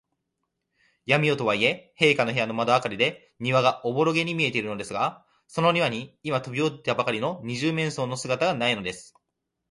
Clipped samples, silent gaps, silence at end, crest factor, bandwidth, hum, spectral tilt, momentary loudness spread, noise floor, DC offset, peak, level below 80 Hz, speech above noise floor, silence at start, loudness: under 0.1%; none; 0.7 s; 22 dB; 11.5 kHz; none; -5 dB/octave; 8 LU; -81 dBFS; under 0.1%; -4 dBFS; -64 dBFS; 56 dB; 1.05 s; -25 LUFS